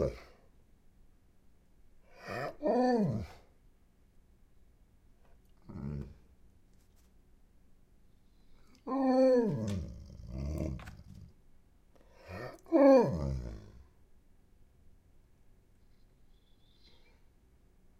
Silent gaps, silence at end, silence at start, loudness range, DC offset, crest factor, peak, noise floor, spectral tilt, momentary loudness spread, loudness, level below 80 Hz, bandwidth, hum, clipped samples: none; 4.3 s; 0 s; 19 LU; under 0.1%; 24 dB; -12 dBFS; -64 dBFS; -8 dB/octave; 25 LU; -31 LUFS; -52 dBFS; 12.5 kHz; none; under 0.1%